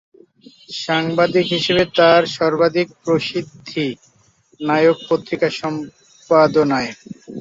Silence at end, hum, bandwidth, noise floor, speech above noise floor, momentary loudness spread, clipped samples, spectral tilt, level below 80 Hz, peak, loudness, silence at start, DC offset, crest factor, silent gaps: 0 s; none; 7.8 kHz; -56 dBFS; 39 dB; 15 LU; under 0.1%; -5.5 dB/octave; -56 dBFS; -2 dBFS; -17 LUFS; 0.7 s; under 0.1%; 16 dB; none